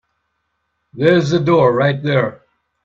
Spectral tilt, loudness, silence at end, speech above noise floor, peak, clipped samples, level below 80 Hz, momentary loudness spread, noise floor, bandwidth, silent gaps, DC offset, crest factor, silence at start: -7 dB/octave; -15 LUFS; 0.55 s; 57 dB; 0 dBFS; under 0.1%; -54 dBFS; 5 LU; -70 dBFS; 7.6 kHz; none; under 0.1%; 16 dB; 0.95 s